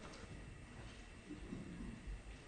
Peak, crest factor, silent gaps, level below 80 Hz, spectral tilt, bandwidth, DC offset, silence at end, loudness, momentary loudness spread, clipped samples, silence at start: -36 dBFS; 16 dB; none; -56 dBFS; -5.5 dB/octave; 9.4 kHz; under 0.1%; 0 s; -53 LUFS; 5 LU; under 0.1%; 0 s